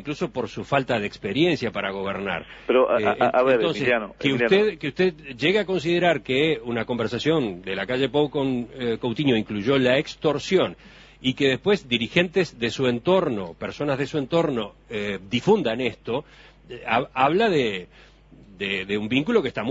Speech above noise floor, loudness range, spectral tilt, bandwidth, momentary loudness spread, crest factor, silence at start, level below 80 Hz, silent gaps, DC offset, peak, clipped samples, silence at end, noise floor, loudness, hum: 26 dB; 3 LU; -6 dB/octave; 8 kHz; 9 LU; 20 dB; 0 s; -54 dBFS; none; under 0.1%; -4 dBFS; under 0.1%; 0 s; -49 dBFS; -23 LUFS; none